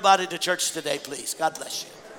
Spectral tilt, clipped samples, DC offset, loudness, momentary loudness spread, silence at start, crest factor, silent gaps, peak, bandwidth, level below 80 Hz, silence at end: -1 dB/octave; under 0.1%; under 0.1%; -26 LUFS; 11 LU; 0 s; 20 dB; none; -6 dBFS; 19 kHz; -74 dBFS; 0 s